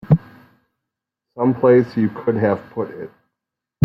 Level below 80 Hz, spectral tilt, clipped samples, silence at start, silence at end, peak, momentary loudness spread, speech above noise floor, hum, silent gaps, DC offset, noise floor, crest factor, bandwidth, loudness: -52 dBFS; -11 dB/octave; under 0.1%; 0.1 s; 0.75 s; -2 dBFS; 15 LU; 65 dB; none; none; under 0.1%; -83 dBFS; 18 dB; 5.8 kHz; -19 LUFS